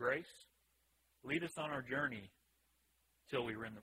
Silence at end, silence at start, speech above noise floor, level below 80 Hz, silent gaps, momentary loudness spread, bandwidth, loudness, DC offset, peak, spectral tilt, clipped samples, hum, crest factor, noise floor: 0 s; 0 s; 35 dB; -76 dBFS; none; 18 LU; 16 kHz; -42 LUFS; under 0.1%; -24 dBFS; -5 dB/octave; under 0.1%; none; 20 dB; -78 dBFS